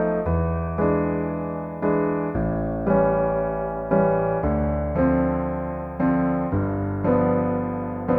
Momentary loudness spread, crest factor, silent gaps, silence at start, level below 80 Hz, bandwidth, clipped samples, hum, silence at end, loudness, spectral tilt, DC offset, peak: 7 LU; 16 dB; none; 0 s; -36 dBFS; 3.4 kHz; under 0.1%; none; 0 s; -23 LUFS; -12 dB/octave; under 0.1%; -8 dBFS